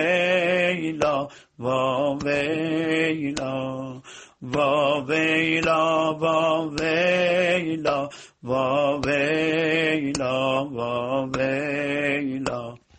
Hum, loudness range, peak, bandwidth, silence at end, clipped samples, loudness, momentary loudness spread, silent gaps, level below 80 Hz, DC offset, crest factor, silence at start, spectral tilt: none; 3 LU; -6 dBFS; 9 kHz; 0.2 s; under 0.1%; -23 LUFS; 9 LU; none; -56 dBFS; under 0.1%; 16 dB; 0 s; -5 dB/octave